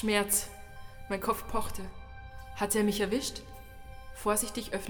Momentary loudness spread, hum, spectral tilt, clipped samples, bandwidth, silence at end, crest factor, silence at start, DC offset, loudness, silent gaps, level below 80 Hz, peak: 21 LU; none; -3 dB/octave; under 0.1%; over 20 kHz; 0 s; 20 dB; 0 s; under 0.1%; -31 LUFS; none; -48 dBFS; -14 dBFS